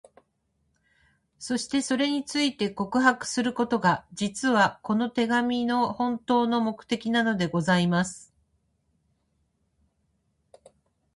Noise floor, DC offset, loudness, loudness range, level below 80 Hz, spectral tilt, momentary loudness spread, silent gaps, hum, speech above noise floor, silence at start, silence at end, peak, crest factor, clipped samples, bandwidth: -73 dBFS; under 0.1%; -25 LUFS; 5 LU; -64 dBFS; -4.5 dB/octave; 7 LU; none; none; 48 dB; 1.4 s; 2.9 s; -6 dBFS; 20 dB; under 0.1%; 11.5 kHz